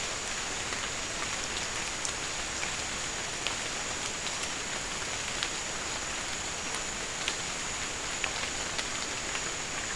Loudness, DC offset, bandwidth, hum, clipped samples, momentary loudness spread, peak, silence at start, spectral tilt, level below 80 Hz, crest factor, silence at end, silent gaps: -32 LUFS; 0.2%; 12 kHz; none; under 0.1%; 1 LU; -8 dBFS; 0 s; -1 dB/octave; -52 dBFS; 26 dB; 0 s; none